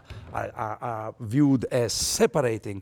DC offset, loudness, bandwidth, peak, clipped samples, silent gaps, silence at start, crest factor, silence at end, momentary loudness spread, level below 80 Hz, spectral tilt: under 0.1%; -25 LUFS; 18.5 kHz; -10 dBFS; under 0.1%; none; 0.1 s; 16 dB; 0 s; 12 LU; -50 dBFS; -4.5 dB/octave